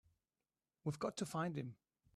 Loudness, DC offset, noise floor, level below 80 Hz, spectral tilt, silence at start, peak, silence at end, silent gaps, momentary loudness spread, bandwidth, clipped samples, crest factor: -44 LUFS; under 0.1%; under -90 dBFS; -78 dBFS; -5.5 dB/octave; 0.85 s; -28 dBFS; 0.45 s; none; 6 LU; 13 kHz; under 0.1%; 20 dB